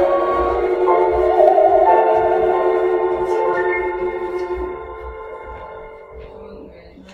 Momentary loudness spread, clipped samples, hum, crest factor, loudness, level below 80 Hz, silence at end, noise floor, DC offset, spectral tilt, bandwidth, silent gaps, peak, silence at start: 24 LU; under 0.1%; none; 18 dB; -16 LUFS; -40 dBFS; 0 s; -40 dBFS; under 0.1%; -7.5 dB/octave; 6.2 kHz; none; 0 dBFS; 0 s